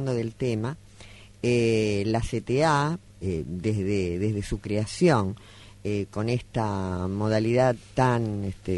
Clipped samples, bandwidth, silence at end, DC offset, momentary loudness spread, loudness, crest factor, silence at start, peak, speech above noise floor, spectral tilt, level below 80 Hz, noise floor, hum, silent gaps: under 0.1%; 11.5 kHz; 0 s; under 0.1%; 9 LU; -26 LUFS; 18 dB; 0 s; -8 dBFS; 22 dB; -6.5 dB/octave; -46 dBFS; -48 dBFS; none; none